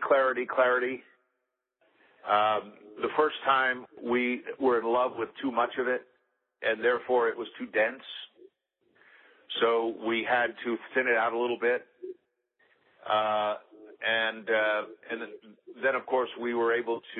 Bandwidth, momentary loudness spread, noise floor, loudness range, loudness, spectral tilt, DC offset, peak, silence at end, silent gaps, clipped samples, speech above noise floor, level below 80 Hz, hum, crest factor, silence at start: 4.2 kHz; 13 LU; -83 dBFS; 3 LU; -28 LUFS; -7.5 dB/octave; under 0.1%; -10 dBFS; 0 s; none; under 0.1%; 54 dB; -76 dBFS; none; 18 dB; 0 s